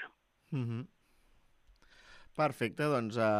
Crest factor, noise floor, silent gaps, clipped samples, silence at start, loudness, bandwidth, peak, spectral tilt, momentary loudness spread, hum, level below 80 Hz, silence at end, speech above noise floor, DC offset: 18 dB; -67 dBFS; none; under 0.1%; 0 s; -35 LUFS; 15 kHz; -20 dBFS; -7 dB/octave; 15 LU; none; -70 dBFS; 0 s; 34 dB; under 0.1%